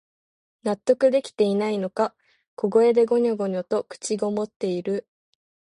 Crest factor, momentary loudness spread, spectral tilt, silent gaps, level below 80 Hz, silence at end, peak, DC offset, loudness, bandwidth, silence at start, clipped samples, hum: 18 dB; 10 LU; -5.5 dB/octave; 2.48-2.57 s, 4.56-4.60 s; -72 dBFS; 0.75 s; -6 dBFS; under 0.1%; -23 LUFS; 11 kHz; 0.65 s; under 0.1%; none